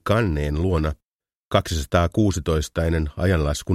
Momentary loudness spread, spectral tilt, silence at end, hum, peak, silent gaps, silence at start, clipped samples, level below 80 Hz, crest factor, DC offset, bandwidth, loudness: 3 LU; -6 dB/octave; 0 s; none; -4 dBFS; 1.05-1.19 s, 1.35-1.51 s; 0.05 s; under 0.1%; -30 dBFS; 18 dB; under 0.1%; 15 kHz; -22 LUFS